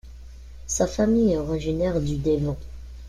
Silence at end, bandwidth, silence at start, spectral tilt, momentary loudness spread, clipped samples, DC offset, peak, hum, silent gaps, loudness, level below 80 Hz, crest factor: 0 s; 13.5 kHz; 0.05 s; -6 dB/octave; 14 LU; under 0.1%; under 0.1%; -8 dBFS; none; none; -24 LUFS; -38 dBFS; 16 dB